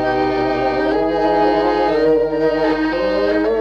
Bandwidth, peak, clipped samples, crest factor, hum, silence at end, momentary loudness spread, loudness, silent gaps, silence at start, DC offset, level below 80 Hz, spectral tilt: 7.2 kHz; -4 dBFS; under 0.1%; 12 dB; none; 0 s; 3 LU; -16 LUFS; none; 0 s; under 0.1%; -40 dBFS; -6.5 dB/octave